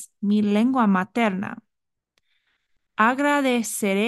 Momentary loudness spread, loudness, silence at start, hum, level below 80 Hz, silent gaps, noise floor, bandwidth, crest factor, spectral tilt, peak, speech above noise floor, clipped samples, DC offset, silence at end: 13 LU; -21 LUFS; 0 s; none; -72 dBFS; none; -81 dBFS; 12.5 kHz; 18 dB; -5 dB/octave; -4 dBFS; 60 dB; under 0.1%; under 0.1%; 0 s